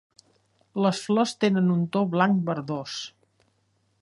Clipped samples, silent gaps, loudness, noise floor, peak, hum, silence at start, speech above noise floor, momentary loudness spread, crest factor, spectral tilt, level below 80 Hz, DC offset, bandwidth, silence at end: under 0.1%; none; -25 LUFS; -69 dBFS; -6 dBFS; none; 0.75 s; 45 dB; 12 LU; 20 dB; -6 dB/octave; -72 dBFS; under 0.1%; 11.5 kHz; 0.95 s